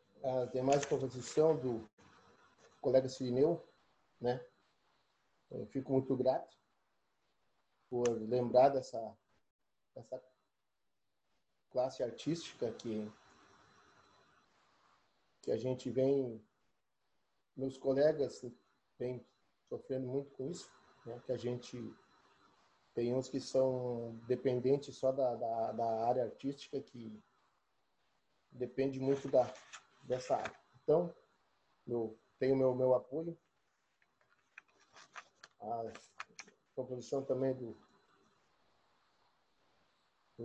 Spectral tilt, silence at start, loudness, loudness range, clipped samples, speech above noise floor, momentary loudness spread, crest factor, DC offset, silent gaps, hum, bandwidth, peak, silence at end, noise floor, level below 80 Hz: -6.5 dB/octave; 0.2 s; -37 LUFS; 9 LU; under 0.1%; 53 dB; 18 LU; 22 dB; under 0.1%; 1.93-1.97 s, 9.51-9.59 s; none; 9.2 kHz; -16 dBFS; 0 s; -89 dBFS; -76 dBFS